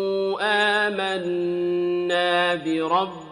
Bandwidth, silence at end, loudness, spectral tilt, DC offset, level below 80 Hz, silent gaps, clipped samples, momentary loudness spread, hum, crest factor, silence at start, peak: 11 kHz; 0 s; -22 LUFS; -4.5 dB/octave; under 0.1%; -66 dBFS; none; under 0.1%; 5 LU; none; 16 dB; 0 s; -6 dBFS